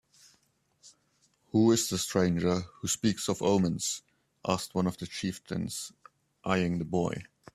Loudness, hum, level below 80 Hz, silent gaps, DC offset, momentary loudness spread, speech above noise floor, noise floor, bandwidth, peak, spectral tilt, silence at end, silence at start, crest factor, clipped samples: -30 LUFS; none; -62 dBFS; none; under 0.1%; 11 LU; 42 dB; -71 dBFS; 14.5 kHz; -10 dBFS; -5 dB/octave; 0.3 s; 0.85 s; 22 dB; under 0.1%